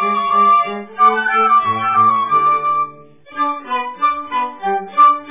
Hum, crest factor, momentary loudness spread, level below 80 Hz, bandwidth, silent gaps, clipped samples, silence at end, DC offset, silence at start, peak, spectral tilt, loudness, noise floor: none; 14 dB; 10 LU; -66 dBFS; 3.8 kHz; none; under 0.1%; 0 s; 0.4%; 0 s; -2 dBFS; -7.5 dB/octave; -15 LUFS; -38 dBFS